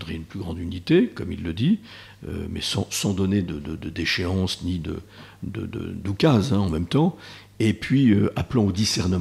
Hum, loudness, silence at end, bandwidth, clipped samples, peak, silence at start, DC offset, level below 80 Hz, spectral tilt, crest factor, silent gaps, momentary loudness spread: none; -24 LUFS; 0 s; 14 kHz; under 0.1%; -6 dBFS; 0 s; under 0.1%; -48 dBFS; -5.5 dB/octave; 18 dB; none; 14 LU